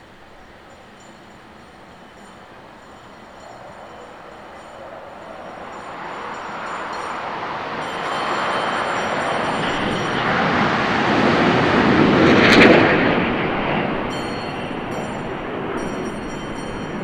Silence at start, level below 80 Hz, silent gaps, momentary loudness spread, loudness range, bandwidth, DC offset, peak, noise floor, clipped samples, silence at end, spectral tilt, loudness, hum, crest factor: 0 s; -44 dBFS; none; 24 LU; 23 LU; 13.5 kHz; under 0.1%; 0 dBFS; -43 dBFS; under 0.1%; 0 s; -5.5 dB/octave; -19 LUFS; none; 20 dB